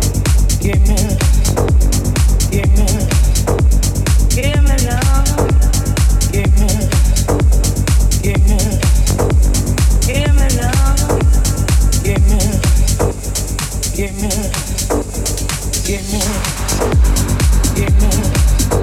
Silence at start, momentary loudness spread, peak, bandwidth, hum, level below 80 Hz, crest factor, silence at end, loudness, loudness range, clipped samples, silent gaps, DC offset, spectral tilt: 0 s; 5 LU; 0 dBFS; 16 kHz; none; -14 dBFS; 12 dB; 0 s; -14 LUFS; 3 LU; under 0.1%; none; under 0.1%; -5 dB/octave